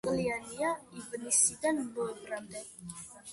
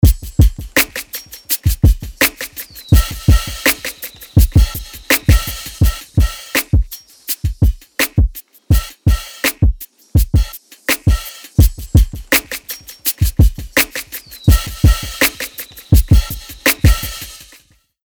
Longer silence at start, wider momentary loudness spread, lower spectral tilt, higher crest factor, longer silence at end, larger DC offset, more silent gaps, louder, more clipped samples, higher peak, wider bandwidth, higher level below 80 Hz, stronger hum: about the same, 0.05 s vs 0.05 s; first, 19 LU vs 13 LU; second, -3 dB/octave vs -4.5 dB/octave; first, 22 dB vs 14 dB; second, 0 s vs 0.7 s; neither; neither; second, -32 LUFS vs -16 LUFS; neither; second, -12 dBFS vs 0 dBFS; second, 12 kHz vs over 20 kHz; second, -66 dBFS vs -18 dBFS; neither